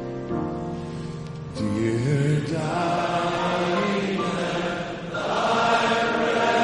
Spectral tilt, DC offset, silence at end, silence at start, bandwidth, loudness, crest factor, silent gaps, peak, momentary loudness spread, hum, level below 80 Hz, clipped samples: -5.5 dB/octave; under 0.1%; 0 s; 0 s; 11 kHz; -24 LUFS; 16 dB; none; -8 dBFS; 11 LU; none; -50 dBFS; under 0.1%